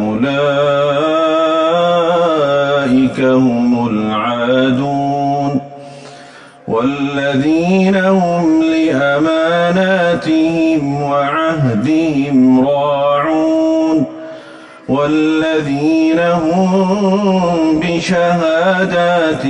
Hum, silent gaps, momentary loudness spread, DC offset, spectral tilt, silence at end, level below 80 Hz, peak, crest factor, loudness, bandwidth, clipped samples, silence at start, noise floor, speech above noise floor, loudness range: none; none; 4 LU; under 0.1%; -6.5 dB/octave; 0 s; -48 dBFS; -2 dBFS; 10 dB; -13 LUFS; 9.6 kHz; under 0.1%; 0 s; -37 dBFS; 25 dB; 3 LU